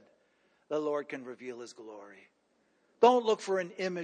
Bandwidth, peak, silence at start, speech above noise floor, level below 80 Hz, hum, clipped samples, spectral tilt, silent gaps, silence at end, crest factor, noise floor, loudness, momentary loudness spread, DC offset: 9.6 kHz; -10 dBFS; 0.7 s; 41 dB; under -90 dBFS; none; under 0.1%; -4.5 dB/octave; none; 0 s; 22 dB; -72 dBFS; -30 LUFS; 23 LU; under 0.1%